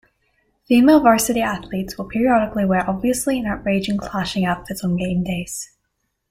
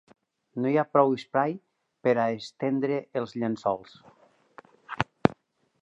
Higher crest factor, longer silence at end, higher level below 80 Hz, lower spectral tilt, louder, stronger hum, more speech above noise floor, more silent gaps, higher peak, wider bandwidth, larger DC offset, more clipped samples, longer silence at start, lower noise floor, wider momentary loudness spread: second, 16 dB vs 28 dB; about the same, 0.65 s vs 0.55 s; first, -44 dBFS vs -62 dBFS; second, -5 dB/octave vs -7.5 dB/octave; first, -19 LUFS vs -27 LUFS; neither; first, 54 dB vs 31 dB; neither; about the same, -2 dBFS vs 0 dBFS; first, 16.5 kHz vs 8.2 kHz; neither; neither; first, 0.7 s vs 0.55 s; first, -73 dBFS vs -57 dBFS; first, 13 LU vs 10 LU